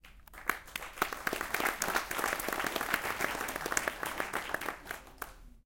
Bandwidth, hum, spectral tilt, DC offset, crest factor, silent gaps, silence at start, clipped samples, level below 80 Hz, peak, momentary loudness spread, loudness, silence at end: 17 kHz; none; -1.5 dB/octave; under 0.1%; 28 dB; none; 0.05 s; under 0.1%; -56 dBFS; -8 dBFS; 11 LU; -35 LUFS; 0.05 s